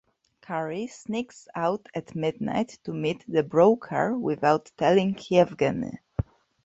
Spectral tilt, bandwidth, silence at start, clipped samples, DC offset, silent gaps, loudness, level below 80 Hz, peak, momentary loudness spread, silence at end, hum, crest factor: -6.5 dB/octave; 8 kHz; 0.5 s; under 0.1%; under 0.1%; none; -26 LUFS; -52 dBFS; -6 dBFS; 13 LU; 0.4 s; none; 20 dB